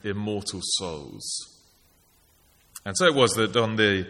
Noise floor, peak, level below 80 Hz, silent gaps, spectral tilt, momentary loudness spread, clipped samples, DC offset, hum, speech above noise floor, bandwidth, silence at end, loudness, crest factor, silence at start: -61 dBFS; -4 dBFS; -60 dBFS; none; -3.5 dB/octave; 16 LU; under 0.1%; under 0.1%; none; 37 dB; 16 kHz; 0 s; -24 LUFS; 22 dB; 0.05 s